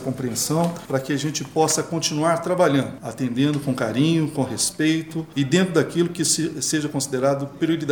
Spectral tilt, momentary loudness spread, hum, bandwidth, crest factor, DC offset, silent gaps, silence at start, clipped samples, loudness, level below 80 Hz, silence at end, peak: -4.5 dB/octave; 6 LU; none; over 20 kHz; 16 dB; under 0.1%; none; 0 s; under 0.1%; -22 LUFS; -58 dBFS; 0 s; -4 dBFS